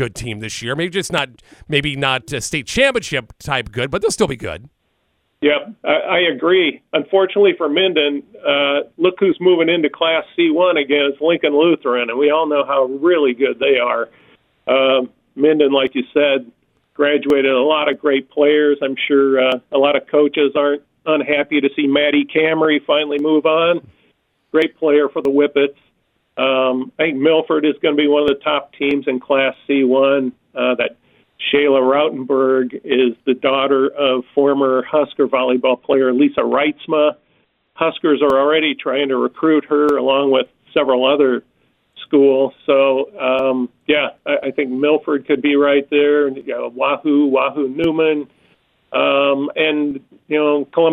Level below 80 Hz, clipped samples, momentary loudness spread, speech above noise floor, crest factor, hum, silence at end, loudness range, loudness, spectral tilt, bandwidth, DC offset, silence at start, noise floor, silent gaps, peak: -52 dBFS; under 0.1%; 7 LU; 50 dB; 16 dB; none; 0 s; 3 LU; -16 LUFS; -4.5 dB/octave; 12 kHz; under 0.1%; 0 s; -66 dBFS; none; 0 dBFS